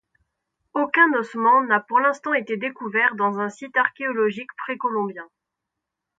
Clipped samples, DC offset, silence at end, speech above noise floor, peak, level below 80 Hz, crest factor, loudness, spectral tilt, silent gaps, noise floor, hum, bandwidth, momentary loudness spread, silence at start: under 0.1%; under 0.1%; 0.95 s; 61 dB; -4 dBFS; -78 dBFS; 20 dB; -21 LUFS; -5.5 dB/octave; none; -83 dBFS; none; 7.8 kHz; 12 LU; 0.75 s